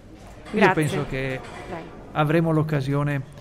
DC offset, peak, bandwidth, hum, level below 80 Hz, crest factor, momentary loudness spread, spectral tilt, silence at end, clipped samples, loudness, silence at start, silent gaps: under 0.1%; -4 dBFS; 14.5 kHz; none; -46 dBFS; 20 dB; 16 LU; -7 dB/octave; 0 s; under 0.1%; -23 LUFS; 0.05 s; none